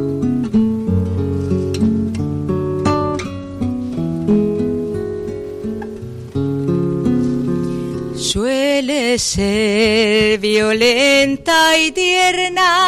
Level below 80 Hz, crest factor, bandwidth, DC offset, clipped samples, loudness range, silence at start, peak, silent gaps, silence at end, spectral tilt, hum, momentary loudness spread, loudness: -40 dBFS; 12 dB; 15.5 kHz; under 0.1%; under 0.1%; 8 LU; 0 s; -4 dBFS; none; 0 s; -4.5 dB/octave; none; 12 LU; -16 LUFS